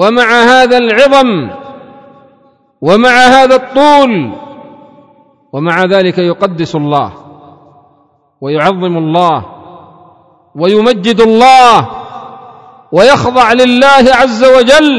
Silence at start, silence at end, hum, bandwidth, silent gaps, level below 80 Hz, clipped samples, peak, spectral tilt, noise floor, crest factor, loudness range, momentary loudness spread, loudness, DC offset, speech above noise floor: 0 s; 0 s; none; 11 kHz; none; -42 dBFS; 7%; 0 dBFS; -5 dB/octave; -51 dBFS; 8 dB; 7 LU; 15 LU; -7 LUFS; under 0.1%; 44 dB